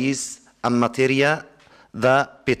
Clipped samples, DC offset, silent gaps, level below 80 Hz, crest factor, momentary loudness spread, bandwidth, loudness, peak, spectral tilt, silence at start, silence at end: under 0.1%; under 0.1%; none; -58 dBFS; 18 dB; 9 LU; 14.5 kHz; -21 LUFS; -4 dBFS; -4.5 dB/octave; 0 s; 0 s